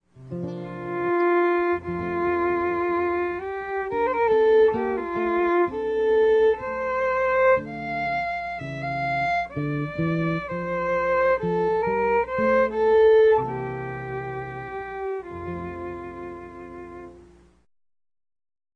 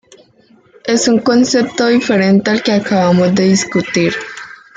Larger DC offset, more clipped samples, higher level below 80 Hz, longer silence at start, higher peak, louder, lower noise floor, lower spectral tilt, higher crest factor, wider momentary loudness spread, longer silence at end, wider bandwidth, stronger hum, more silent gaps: neither; neither; about the same, -52 dBFS vs -54 dBFS; second, 0.15 s vs 0.85 s; second, -10 dBFS vs 0 dBFS; second, -23 LUFS vs -12 LUFS; about the same, -51 dBFS vs -49 dBFS; first, -8 dB/octave vs -5 dB/octave; about the same, 14 dB vs 12 dB; first, 15 LU vs 7 LU; first, 1.5 s vs 0.25 s; second, 6.4 kHz vs 9.4 kHz; neither; neither